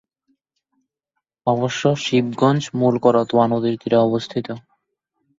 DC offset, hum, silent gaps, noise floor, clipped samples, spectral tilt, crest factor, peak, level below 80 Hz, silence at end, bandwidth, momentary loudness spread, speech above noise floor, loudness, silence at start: under 0.1%; none; none; -79 dBFS; under 0.1%; -6.5 dB/octave; 18 dB; -2 dBFS; -60 dBFS; 0.8 s; 7.8 kHz; 10 LU; 61 dB; -19 LUFS; 1.45 s